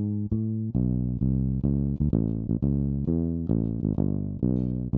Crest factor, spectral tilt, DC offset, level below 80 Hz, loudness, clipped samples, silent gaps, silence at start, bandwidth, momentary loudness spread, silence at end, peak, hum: 16 dB; -15 dB/octave; under 0.1%; -36 dBFS; -27 LUFS; under 0.1%; none; 0 s; 1.7 kHz; 2 LU; 0 s; -10 dBFS; none